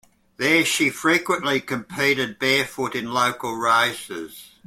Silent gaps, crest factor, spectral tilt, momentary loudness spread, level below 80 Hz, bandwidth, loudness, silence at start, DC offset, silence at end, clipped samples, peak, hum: none; 18 dB; -3 dB/octave; 11 LU; -62 dBFS; 16.5 kHz; -21 LUFS; 0.4 s; under 0.1%; 0.2 s; under 0.1%; -6 dBFS; none